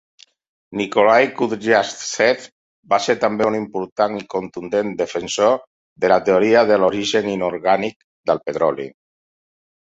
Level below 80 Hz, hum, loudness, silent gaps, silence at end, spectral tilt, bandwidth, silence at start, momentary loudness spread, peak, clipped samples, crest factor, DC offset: -60 dBFS; none; -18 LUFS; 2.52-2.83 s, 3.92-3.96 s, 5.67-5.96 s, 7.96-8.24 s; 1 s; -4 dB/octave; 8 kHz; 0.7 s; 12 LU; -2 dBFS; under 0.1%; 18 dB; under 0.1%